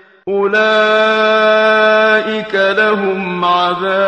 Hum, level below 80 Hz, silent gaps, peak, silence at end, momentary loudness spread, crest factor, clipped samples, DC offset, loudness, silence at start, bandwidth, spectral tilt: none; -58 dBFS; none; 0 dBFS; 0 s; 7 LU; 12 dB; under 0.1%; under 0.1%; -12 LUFS; 0.25 s; 9 kHz; -5 dB/octave